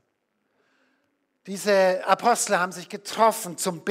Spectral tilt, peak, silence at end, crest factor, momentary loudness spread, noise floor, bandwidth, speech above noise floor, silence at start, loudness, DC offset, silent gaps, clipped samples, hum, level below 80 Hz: -3 dB/octave; -4 dBFS; 0 s; 20 dB; 11 LU; -74 dBFS; 16 kHz; 51 dB; 1.45 s; -23 LUFS; under 0.1%; none; under 0.1%; none; -82 dBFS